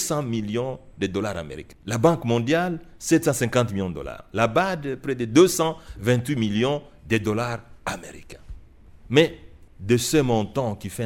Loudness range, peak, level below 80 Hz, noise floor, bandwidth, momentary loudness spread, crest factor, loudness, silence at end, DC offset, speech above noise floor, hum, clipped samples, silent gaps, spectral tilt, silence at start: 4 LU; -2 dBFS; -48 dBFS; -47 dBFS; 16.5 kHz; 12 LU; 20 dB; -23 LUFS; 0 s; under 0.1%; 24 dB; none; under 0.1%; none; -5 dB/octave; 0 s